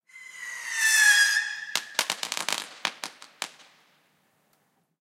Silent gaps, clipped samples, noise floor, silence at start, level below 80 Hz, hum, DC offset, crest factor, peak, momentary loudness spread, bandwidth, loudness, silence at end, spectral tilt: none; under 0.1%; -70 dBFS; 0.15 s; under -90 dBFS; none; under 0.1%; 26 dB; -2 dBFS; 21 LU; 16.5 kHz; -23 LUFS; 1.5 s; 2.5 dB/octave